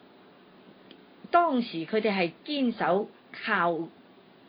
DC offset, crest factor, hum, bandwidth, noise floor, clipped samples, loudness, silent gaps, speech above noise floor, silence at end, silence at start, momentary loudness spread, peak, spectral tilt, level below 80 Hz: under 0.1%; 22 dB; none; 5.2 kHz; -55 dBFS; under 0.1%; -28 LUFS; none; 28 dB; 0.6 s; 1.25 s; 11 LU; -8 dBFS; -9.5 dB/octave; -80 dBFS